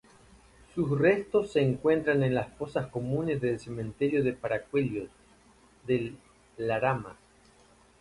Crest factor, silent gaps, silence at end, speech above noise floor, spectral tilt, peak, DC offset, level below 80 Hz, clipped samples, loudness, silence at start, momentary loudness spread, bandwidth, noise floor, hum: 18 dB; none; 0.85 s; 32 dB; -8 dB/octave; -12 dBFS; under 0.1%; -58 dBFS; under 0.1%; -29 LUFS; 0.75 s; 13 LU; 11.5 kHz; -60 dBFS; none